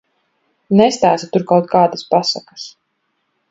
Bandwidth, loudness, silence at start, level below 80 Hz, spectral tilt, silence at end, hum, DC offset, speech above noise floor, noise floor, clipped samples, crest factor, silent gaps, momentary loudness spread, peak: 8 kHz; -15 LUFS; 0.7 s; -60 dBFS; -5.5 dB/octave; 0.8 s; none; under 0.1%; 54 dB; -69 dBFS; under 0.1%; 16 dB; none; 18 LU; 0 dBFS